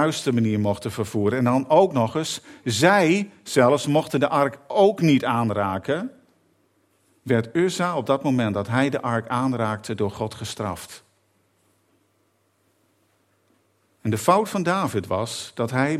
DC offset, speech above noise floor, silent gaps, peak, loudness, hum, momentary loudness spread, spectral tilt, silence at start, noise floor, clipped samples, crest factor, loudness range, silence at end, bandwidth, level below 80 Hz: under 0.1%; 45 dB; none; -2 dBFS; -22 LUFS; none; 11 LU; -5.5 dB/octave; 0 s; -67 dBFS; under 0.1%; 22 dB; 12 LU; 0 s; 15.5 kHz; -64 dBFS